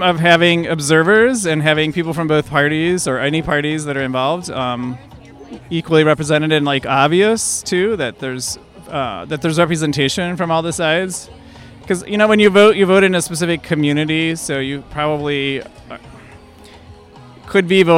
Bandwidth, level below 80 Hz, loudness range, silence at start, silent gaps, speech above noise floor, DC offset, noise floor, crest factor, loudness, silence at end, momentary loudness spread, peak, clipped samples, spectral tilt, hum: 16 kHz; -46 dBFS; 6 LU; 0 s; none; 25 dB; under 0.1%; -41 dBFS; 16 dB; -15 LUFS; 0 s; 13 LU; 0 dBFS; under 0.1%; -4.5 dB/octave; none